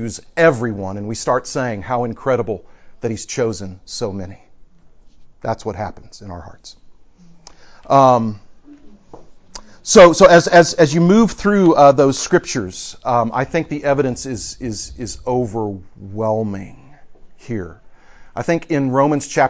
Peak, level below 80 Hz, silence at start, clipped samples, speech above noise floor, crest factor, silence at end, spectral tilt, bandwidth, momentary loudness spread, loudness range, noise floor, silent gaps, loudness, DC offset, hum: 0 dBFS; -44 dBFS; 0 s; under 0.1%; 28 dB; 16 dB; 0 s; -5 dB/octave; 8 kHz; 19 LU; 15 LU; -44 dBFS; none; -16 LUFS; under 0.1%; none